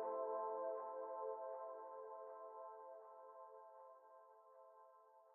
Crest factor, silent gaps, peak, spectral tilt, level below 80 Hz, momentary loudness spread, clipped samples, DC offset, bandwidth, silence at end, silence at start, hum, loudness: 16 dB; none; -34 dBFS; 4 dB/octave; under -90 dBFS; 21 LU; under 0.1%; under 0.1%; 2.6 kHz; 0 s; 0 s; none; -50 LUFS